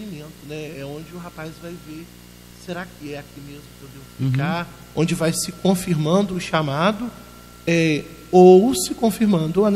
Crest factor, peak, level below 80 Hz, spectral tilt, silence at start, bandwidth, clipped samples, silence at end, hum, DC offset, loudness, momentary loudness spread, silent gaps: 18 dB; -2 dBFS; -50 dBFS; -6 dB/octave; 0 s; 15.5 kHz; under 0.1%; 0 s; 60 Hz at -40 dBFS; under 0.1%; -19 LUFS; 22 LU; none